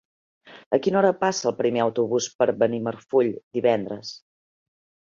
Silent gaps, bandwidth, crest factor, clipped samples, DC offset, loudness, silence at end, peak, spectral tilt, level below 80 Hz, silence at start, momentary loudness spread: 0.66-0.71 s, 2.35-2.39 s, 3.43-3.51 s; 7.6 kHz; 18 dB; under 0.1%; under 0.1%; -23 LUFS; 0.95 s; -6 dBFS; -5 dB/octave; -68 dBFS; 0.45 s; 7 LU